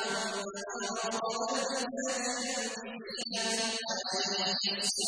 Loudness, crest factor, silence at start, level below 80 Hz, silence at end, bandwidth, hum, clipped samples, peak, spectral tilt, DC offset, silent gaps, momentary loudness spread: -33 LUFS; 16 dB; 0 s; -76 dBFS; 0 s; 11 kHz; none; under 0.1%; -18 dBFS; -1 dB/octave; under 0.1%; none; 8 LU